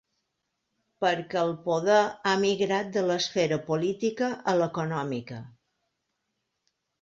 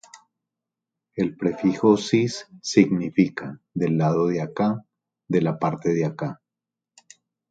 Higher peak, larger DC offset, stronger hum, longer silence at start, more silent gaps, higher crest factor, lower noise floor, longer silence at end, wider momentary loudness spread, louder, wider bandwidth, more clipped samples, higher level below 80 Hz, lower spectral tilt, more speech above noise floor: second, -10 dBFS vs -2 dBFS; neither; neither; first, 1 s vs 0.15 s; neither; about the same, 18 dB vs 22 dB; second, -80 dBFS vs -88 dBFS; first, 1.5 s vs 1.15 s; second, 8 LU vs 13 LU; second, -27 LUFS vs -23 LUFS; second, 7.8 kHz vs 9.2 kHz; neither; second, -70 dBFS vs -62 dBFS; second, -5 dB/octave vs -6.5 dB/octave; second, 54 dB vs 66 dB